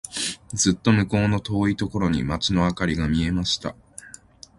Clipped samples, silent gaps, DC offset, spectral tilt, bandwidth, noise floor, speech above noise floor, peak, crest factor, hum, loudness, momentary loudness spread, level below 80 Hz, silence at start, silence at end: under 0.1%; none; under 0.1%; -4.5 dB/octave; 11.5 kHz; -47 dBFS; 25 dB; -4 dBFS; 20 dB; none; -23 LUFS; 14 LU; -40 dBFS; 0.05 s; 0.5 s